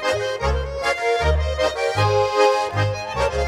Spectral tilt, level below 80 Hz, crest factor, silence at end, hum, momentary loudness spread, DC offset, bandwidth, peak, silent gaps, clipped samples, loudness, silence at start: -4.5 dB/octave; -30 dBFS; 16 dB; 0 s; none; 6 LU; under 0.1%; 14 kHz; -4 dBFS; none; under 0.1%; -20 LUFS; 0 s